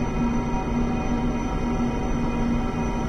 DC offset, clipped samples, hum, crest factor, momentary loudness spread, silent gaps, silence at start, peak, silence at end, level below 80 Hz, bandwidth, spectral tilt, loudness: under 0.1%; under 0.1%; none; 10 dB; 2 LU; none; 0 s; -12 dBFS; 0 s; -30 dBFS; 9 kHz; -7 dB/octave; -26 LUFS